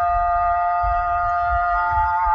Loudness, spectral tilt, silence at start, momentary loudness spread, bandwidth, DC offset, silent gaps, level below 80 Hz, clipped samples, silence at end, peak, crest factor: -20 LUFS; -6.5 dB/octave; 0 s; 1 LU; 6 kHz; under 0.1%; none; -32 dBFS; under 0.1%; 0 s; -10 dBFS; 10 dB